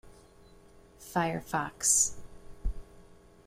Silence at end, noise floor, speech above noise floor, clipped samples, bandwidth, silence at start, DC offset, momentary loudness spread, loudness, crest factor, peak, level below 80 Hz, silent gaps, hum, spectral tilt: 0.35 s; -56 dBFS; 27 dB; under 0.1%; 16 kHz; 0.05 s; under 0.1%; 20 LU; -28 LUFS; 22 dB; -12 dBFS; -46 dBFS; none; 60 Hz at -60 dBFS; -2.5 dB/octave